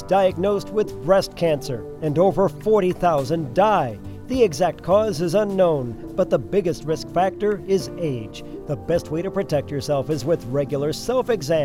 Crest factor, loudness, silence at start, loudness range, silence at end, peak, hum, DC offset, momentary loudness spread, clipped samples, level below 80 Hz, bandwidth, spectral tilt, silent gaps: 16 dB; -22 LUFS; 0 s; 4 LU; 0 s; -4 dBFS; none; under 0.1%; 8 LU; under 0.1%; -44 dBFS; 16.5 kHz; -6.5 dB/octave; none